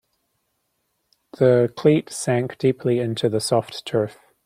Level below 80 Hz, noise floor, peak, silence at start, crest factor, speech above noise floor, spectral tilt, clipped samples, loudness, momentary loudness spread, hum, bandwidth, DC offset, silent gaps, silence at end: -64 dBFS; -73 dBFS; -4 dBFS; 1.4 s; 18 dB; 52 dB; -6 dB/octave; under 0.1%; -21 LUFS; 7 LU; none; 15 kHz; under 0.1%; none; 0.35 s